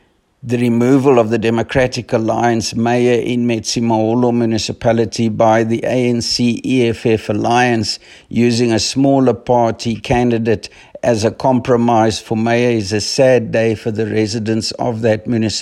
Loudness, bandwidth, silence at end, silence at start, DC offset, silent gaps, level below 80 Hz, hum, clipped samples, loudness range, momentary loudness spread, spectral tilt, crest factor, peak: -15 LUFS; 12.5 kHz; 0 s; 0.45 s; under 0.1%; none; -46 dBFS; none; under 0.1%; 1 LU; 6 LU; -5.5 dB/octave; 14 dB; 0 dBFS